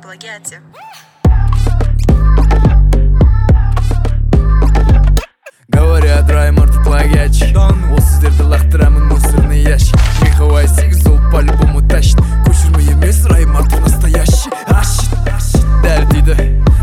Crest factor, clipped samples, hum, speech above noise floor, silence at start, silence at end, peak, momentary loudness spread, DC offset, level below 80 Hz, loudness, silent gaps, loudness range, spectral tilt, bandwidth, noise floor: 8 dB; under 0.1%; none; 27 dB; 0.1 s; 0 s; 0 dBFS; 4 LU; under 0.1%; -10 dBFS; -11 LUFS; none; 2 LU; -6 dB/octave; 15 kHz; -35 dBFS